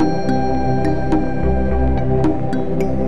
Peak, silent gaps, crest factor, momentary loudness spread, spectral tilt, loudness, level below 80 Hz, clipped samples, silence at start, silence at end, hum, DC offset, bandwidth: -4 dBFS; none; 12 dB; 3 LU; -9 dB/octave; -19 LUFS; -24 dBFS; under 0.1%; 0 s; 0 s; none; 10%; 9 kHz